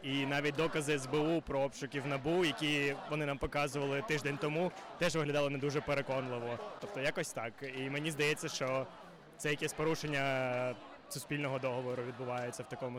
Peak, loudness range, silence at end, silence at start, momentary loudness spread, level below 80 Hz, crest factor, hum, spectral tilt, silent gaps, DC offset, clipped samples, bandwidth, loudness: -26 dBFS; 3 LU; 0 s; 0 s; 9 LU; -60 dBFS; 10 dB; none; -4.5 dB/octave; none; under 0.1%; under 0.1%; 16.5 kHz; -36 LUFS